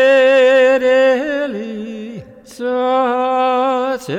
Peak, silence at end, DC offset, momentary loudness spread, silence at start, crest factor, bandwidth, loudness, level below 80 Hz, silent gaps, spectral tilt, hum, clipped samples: -4 dBFS; 0 s; under 0.1%; 17 LU; 0 s; 10 dB; 9.8 kHz; -14 LUFS; -58 dBFS; none; -4.5 dB/octave; none; under 0.1%